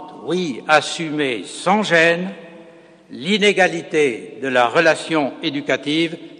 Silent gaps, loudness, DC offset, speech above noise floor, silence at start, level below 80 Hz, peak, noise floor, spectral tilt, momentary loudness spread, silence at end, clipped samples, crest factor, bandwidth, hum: none; -18 LUFS; under 0.1%; 26 dB; 0 s; -68 dBFS; 0 dBFS; -45 dBFS; -4 dB/octave; 9 LU; 0.05 s; under 0.1%; 18 dB; 10 kHz; none